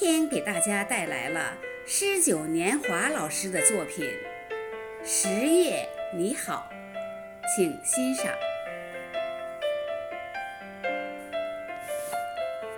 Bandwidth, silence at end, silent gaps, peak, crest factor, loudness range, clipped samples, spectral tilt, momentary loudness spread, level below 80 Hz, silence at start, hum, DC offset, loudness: over 20 kHz; 0 s; none; -6 dBFS; 22 dB; 8 LU; under 0.1%; -2.5 dB/octave; 14 LU; -66 dBFS; 0 s; none; under 0.1%; -28 LUFS